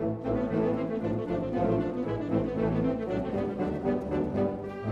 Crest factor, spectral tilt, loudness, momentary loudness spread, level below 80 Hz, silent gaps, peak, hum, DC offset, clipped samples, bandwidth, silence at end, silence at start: 16 dB; -9.5 dB/octave; -30 LUFS; 3 LU; -48 dBFS; none; -14 dBFS; none; under 0.1%; under 0.1%; 8 kHz; 0 s; 0 s